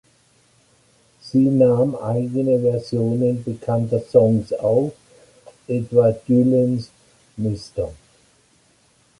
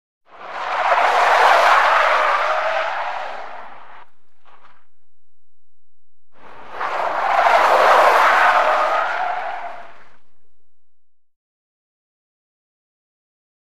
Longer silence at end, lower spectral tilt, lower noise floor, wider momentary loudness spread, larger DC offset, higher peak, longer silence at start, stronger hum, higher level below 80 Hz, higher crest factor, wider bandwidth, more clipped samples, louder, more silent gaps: second, 1.25 s vs 2.3 s; first, -9.5 dB/octave vs -1 dB/octave; second, -58 dBFS vs under -90 dBFS; second, 11 LU vs 19 LU; second, under 0.1% vs 3%; about the same, -2 dBFS vs 0 dBFS; first, 1.25 s vs 0.2 s; neither; first, -52 dBFS vs -64 dBFS; about the same, 18 dB vs 18 dB; second, 11.5 kHz vs 15.5 kHz; neither; second, -20 LUFS vs -15 LUFS; neither